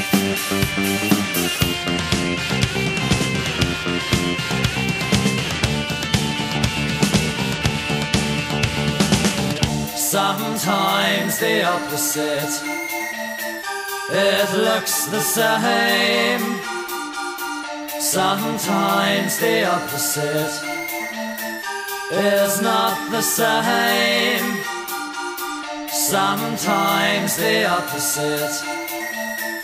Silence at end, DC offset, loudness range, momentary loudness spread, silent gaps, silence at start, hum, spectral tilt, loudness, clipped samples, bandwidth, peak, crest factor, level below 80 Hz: 0 s; under 0.1%; 2 LU; 9 LU; none; 0 s; none; -3.5 dB/octave; -20 LUFS; under 0.1%; 16 kHz; -2 dBFS; 20 dB; -42 dBFS